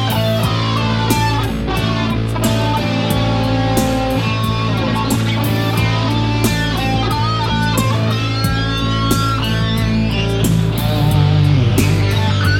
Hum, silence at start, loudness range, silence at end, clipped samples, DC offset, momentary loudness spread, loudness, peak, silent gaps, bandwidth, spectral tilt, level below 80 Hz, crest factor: none; 0 s; 2 LU; 0 s; under 0.1%; 0.4%; 3 LU; -16 LUFS; 0 dBFS; none; 17.5 kHz; -5.5 dB/octave; -28 dBFS; 14 dB